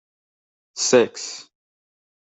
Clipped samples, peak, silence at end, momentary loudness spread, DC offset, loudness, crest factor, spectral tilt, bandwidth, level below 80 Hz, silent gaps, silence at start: under 0.1%; -4 dBFS; 0.8 s; 20 LU; under 0.1%; -19 LUFS; 22 dB; -2.5 dB/octave; 8.4 kHz; -74 dBFS; none; 0.75 s